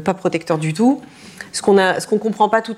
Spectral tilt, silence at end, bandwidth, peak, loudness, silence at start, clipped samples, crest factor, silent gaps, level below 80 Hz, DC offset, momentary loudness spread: -5 dB/octave; 0 s; 14 kHz; -2 dBFS; -17 LUFS; 0 s; under 0.1%; 16 dB; none; -60 dBFS; under 0.1%; 10 LU